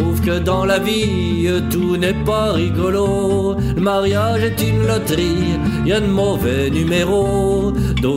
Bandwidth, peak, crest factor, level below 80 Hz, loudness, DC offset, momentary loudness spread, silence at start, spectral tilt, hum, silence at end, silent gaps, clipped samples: 16 kHz; -4 dBFS; 12 dB; -30 dBFS; -17 LUFS; under 0.1%; 2 LU; 0 s; -6 dB/octave; none; 0 s; none; under 0.1%